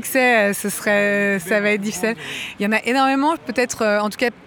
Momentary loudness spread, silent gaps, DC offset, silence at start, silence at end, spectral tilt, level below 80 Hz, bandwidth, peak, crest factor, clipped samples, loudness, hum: 8 LU; none; under 0.1%; 0 s; 0.15 s; -3.5 dB/octave; -60 dBFS; over 20 kHz; -4 dBFS; 14 dB; under 0.1%; -19 LUFS; none